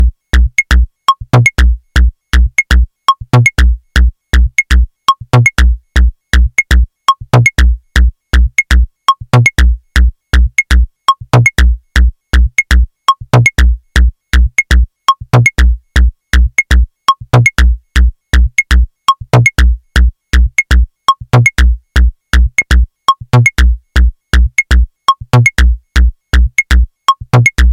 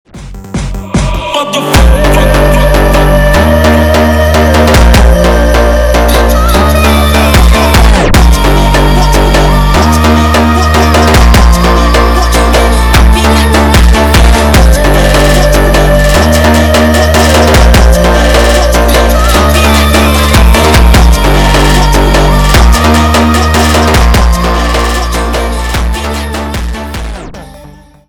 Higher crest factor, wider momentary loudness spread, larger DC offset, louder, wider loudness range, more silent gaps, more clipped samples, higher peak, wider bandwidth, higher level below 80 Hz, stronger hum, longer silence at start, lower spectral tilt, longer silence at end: about the same, 10 dB vs 6 dB; second, 4 LU vs 7 LU; neither; second, -11 LUFS vs -6 LUFS; about the same, 1 LU vs 2 LU; neither; second, under 0.1% vs 0.9%; about the same, 0 dBFS vs 0 dBFS; second, 12 kHz vs 19 kHz; about the same, -10 dBFS vs -8 dBFS; neither; second, 0 s vs 0.15 s; about the same, -5 dB/octave vs -5 dB/octave; second, 0 s vs 0.4 s